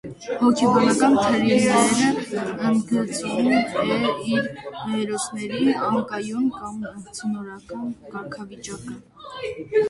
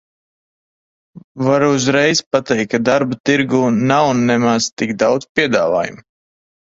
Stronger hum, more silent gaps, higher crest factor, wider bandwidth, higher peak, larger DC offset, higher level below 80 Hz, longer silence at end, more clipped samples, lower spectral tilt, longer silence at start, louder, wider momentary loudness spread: neither; second, none vs 1.24-1.35 s, 2.26-2.31 s, 3.20-3.24 s, 4.73-4.77 s, 5.29-5.35 s; about the same, 18 dB vs 16 dB; first, 11.5 kHz vs 7.8 kHz; second, -4 dBFS vs 0 dBFS; neither; about the same, -58 dBFS vs -54 dBFS; second, 0 s vs 0.8 s; neither; about the same, -4.5 dB/octave vs -4.5 dB/octave; second, 0.05 s vs 1.15 s; second, -22 LUFS vs -15 LUFS; first, 17 LU vs 4 LU